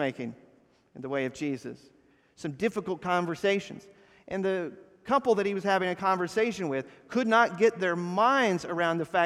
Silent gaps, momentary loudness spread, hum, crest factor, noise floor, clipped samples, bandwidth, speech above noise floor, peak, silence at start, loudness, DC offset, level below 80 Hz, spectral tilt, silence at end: none; 16 LU; none; 20 dB; -62 dBFS; under 0.1%; 13.5 kHz; 34 dB; -10 dBFS; 0 s; -28 LUFS; under 0.1%; -68 dBFS; -5.5 dB/octave; 0 s